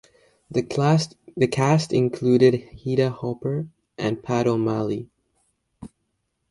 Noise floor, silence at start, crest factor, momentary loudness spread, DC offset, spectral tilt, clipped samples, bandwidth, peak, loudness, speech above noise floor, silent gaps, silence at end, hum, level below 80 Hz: -75 dBFS; 0.5 s; 20 dB; 11 LU; under 0.1%; -7 dB/octave; under 0.1%; 11.5 kHz; -4 dBFS; -23 LUFS; 53 dB; none; 0.65 s; none; -58 dBFS